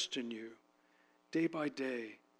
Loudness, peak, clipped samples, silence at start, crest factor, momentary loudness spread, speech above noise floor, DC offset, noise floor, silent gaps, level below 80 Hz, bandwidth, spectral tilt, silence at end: -40 LUFS; -24 dBFS; under 0.1%; 0 s; 16 dB; 11 LU; 32 dB; under 0.1%; -71 dBFS; none; under -90 dBFS; 11 kHz; -4 dB/octave; 0.25 s